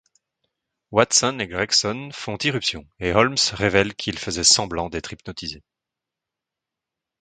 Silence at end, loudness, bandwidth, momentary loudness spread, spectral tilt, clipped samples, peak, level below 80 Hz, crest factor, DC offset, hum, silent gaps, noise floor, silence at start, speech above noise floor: 1.65 s; -20 LUFS; 11 kHz; 15 LU; -2.5 dB/octave; under 0.1%; 0 dBFS; -48 dBFS; 24 dB; under 0.1%; none; none; -86 dBFS; 0.9 s; 64 dB